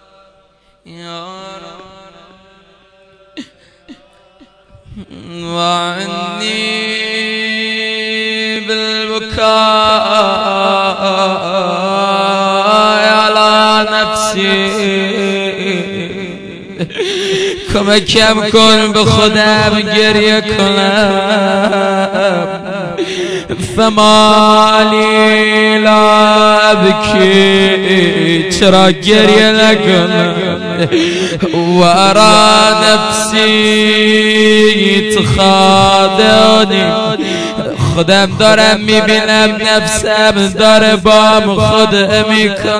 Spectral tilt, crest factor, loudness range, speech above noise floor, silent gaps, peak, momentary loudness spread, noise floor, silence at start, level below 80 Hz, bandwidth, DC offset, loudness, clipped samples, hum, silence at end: -4 dB/octave; 10 dB; 8 LU; 41 dB; none; 0 dBFS; 10 LU; -50 dBFS; 0.85 s; -38 dBFS; 11 kHz; under 0.1%; -9 LUFS; 2%; none; 0 s